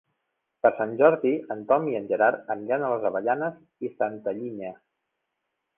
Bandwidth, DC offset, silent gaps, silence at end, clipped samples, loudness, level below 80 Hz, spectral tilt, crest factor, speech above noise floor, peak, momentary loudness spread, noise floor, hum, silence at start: 3.6 kHz; under 0.1%; none; 1.05 s; under 0.1%; -25 LUFS; -72 dBFS; -10 dB/octave; 22 dB; 56 dB; -4 dBFS; 14 LU; -81 dBFS; none; 0.65 s